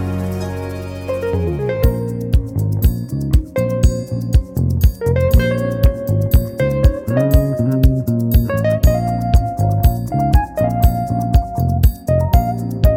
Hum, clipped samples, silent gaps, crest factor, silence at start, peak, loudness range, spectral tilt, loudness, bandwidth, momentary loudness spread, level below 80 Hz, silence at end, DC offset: none; under 0.1%; none; 14 dB; 0 s; -2 dBFS; 3 LU; -8 dB/octave; -17 LUFS; 16.5 kHz; 6 LU; -20 dBFS; 0 s; under 0.1%